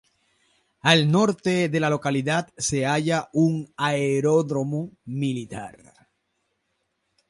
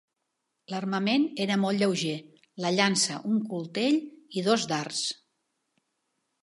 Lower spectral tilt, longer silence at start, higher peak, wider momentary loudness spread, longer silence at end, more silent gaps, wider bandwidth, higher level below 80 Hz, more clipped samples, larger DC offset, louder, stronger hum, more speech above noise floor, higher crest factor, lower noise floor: about the same, -5 dB/octave vs -4 dB/octave; first, 0.85 s vs 0.7 s; about the same, -6 dBFS vs -8 dBFS; about the same, 12 LU vs 10 LU; first, 1.6 s vs 1.3 s; neither; about the same, 11.5 kHz vs 11.5 kHz; first, -62 dBFS vs -80 dBFS; neither; neither; first, -23 LUFS vs -27 LUFS; neither; about the same, 52 dB vs 54 dB; about the same, 20 dB vs 22 dB; second, -75 dBFS vs -81 dBFS